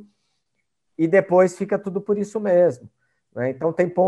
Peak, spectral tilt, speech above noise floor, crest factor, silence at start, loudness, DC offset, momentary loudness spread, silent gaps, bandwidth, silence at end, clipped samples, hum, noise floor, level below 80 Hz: -2 dBFS; -8 dB/octave; 57 dB; 18 dB; 1 s; -21 LUFS; under 0.1%; 10 LU; none; 11 kHz; 0 s; under 0.1%; none; -77 dBFS; -68 dBFS